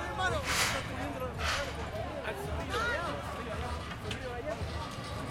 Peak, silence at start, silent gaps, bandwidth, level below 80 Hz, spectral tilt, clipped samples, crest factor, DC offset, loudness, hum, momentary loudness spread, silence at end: -16 dBFS; 0 s; none; 16.5 kHz; -46 dBFS; -3.5 dB/octave; under 0.1%; 18 dB; under 0.1%; -35 LUFS; none; 9 LU; 0 s